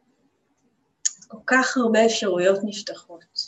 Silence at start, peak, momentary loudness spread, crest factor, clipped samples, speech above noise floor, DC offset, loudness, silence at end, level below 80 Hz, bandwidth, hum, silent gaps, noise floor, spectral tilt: 1.05 s; -6 dBFS; 15 LU; 18 dB; under 0.1%; 46 dB; under 0.1%; -22 LUFS; 0 s; -72 dBFS; 9.2 kHz; none; none; -68 dBFS; -2.5 dB/octave